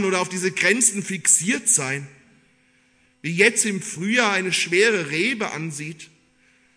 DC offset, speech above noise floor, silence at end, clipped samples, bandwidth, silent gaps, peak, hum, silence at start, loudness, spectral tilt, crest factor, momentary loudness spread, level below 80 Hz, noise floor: under 0.1%; 39 dB; 0.7 s; under 0.1%; 11 kHz; none; -2 dBFS; none; 0 s; -19 LUFS; -2.5 dB/octave; 20 dB; 13 LU; -72 dBFS; -60 dBFS